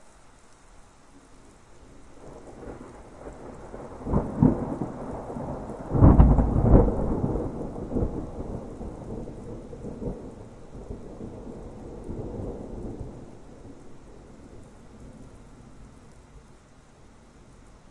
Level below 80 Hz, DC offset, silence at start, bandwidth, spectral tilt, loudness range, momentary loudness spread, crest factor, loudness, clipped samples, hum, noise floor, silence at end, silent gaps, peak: -32 dBFS; under 0.1%; 0.05 s; 9.4 kHz; -10 dB/octave; 23 LU; 28 LU; 26 dB; -26 LUFS; under 0.1%; none; -52 dBFS; 1.5 s; none; -2 dBFS